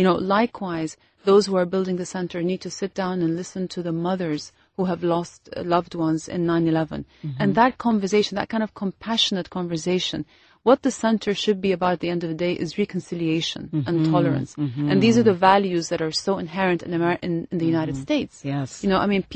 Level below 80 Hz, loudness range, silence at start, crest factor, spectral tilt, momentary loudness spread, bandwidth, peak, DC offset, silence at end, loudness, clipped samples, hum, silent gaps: -54 dBFS; 5 LU; 0 s; 20 dB; -5.5 dB/octave; 10 LU; 8.8 kHz; -4 dBFS; under 0.1%; 0 s; -23 LUFS; under 0.1%; none; none